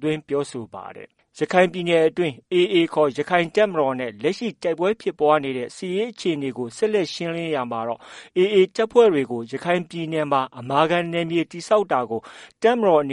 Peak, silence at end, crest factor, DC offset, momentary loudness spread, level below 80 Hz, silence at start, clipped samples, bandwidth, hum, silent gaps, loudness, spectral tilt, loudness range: -2 dBFS; 0 s; 20 dB; under 0.1%; 10 LU; -66 dBFS; 0 s; under 0.1%; 11 kHz; none; none; -22 LUFS; -5.5 dB/octave; 3 LU